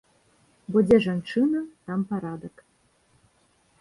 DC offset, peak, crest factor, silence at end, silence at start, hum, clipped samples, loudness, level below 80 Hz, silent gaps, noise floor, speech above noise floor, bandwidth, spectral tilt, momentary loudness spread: under 0.1%; -6 dBFS; 20 dB; 1.3 s; 0.7 s; none; under 0.1%; -24 LUFS; -60 dBFS; none; -65 dBFS; 41 dB; 11.5 kHz; -8 dB/octave; 20 LU